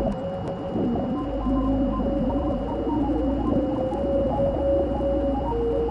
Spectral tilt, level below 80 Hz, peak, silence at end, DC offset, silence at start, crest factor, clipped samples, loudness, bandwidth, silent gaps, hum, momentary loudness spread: -9.5 dB/octave; -32 dBFS; -12 dBFS; 0 s; under 0.1%; 0 s; 12 dB; under 0.1%; -25 LUFS; 7.6 kHz; none; none; 4 LU